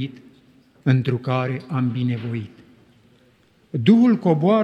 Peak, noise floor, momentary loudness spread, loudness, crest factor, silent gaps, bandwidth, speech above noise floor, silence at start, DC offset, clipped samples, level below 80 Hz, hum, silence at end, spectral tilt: -2 dBFS; -57 dBFS; 16 LU; -20 LUFS; 18 dB; none; 6.6 kHz; 38 dB; 0 s; under 0.1%; under 0.1%; -66 dBFS; none; 0 s; -9 dB/octave